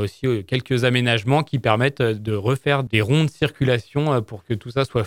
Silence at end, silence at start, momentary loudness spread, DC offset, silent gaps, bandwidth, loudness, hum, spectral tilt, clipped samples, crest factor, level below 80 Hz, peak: 0 s; 0 s; 6 LU; under 0.1%; none; 16 kHz; -21 LUFS; none; -6.5 dB/octave; under 0.1%; 20 dB; -52 dBFS; 0 dBFS